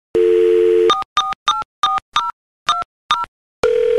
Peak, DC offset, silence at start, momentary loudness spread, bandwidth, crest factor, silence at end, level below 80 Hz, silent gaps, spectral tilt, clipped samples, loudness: 0 dBFS; 0.3%; 0.15 s; 8 LU; 11.5 kHz; 16 dB; 0 s; -52 dBFS; 1.05-1.16 s, 1.35-1.46 s, 1.65-1.83 s, 2.02-2.12 s, 2.33-2.66 s, 2.85-3.09 s, 3.28-3.63 s; -3 dB/octave; under 0.1%; -17 LUFS